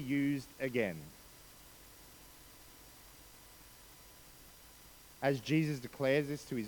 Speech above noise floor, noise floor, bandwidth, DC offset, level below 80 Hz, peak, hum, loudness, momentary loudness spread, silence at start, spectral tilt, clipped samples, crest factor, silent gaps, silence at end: 23 dB; -58 dBFS; 19 kHz; under 0.1%; -66 dBFS; -18 dBFS; none; -35 LUFS; 22 LU; 0 s; -6 dB/octave; under 0.1%; 20 dB; none; 0 s